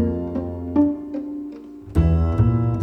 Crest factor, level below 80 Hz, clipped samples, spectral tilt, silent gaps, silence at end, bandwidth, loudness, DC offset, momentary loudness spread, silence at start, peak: 16 dB; -28 dBFS; under 0.1%; -11 dB/octave; none; 0 s; 5.4 kHz; -22 LUFS; under 0.1%; 13 LU; 0 s; -6 dBFS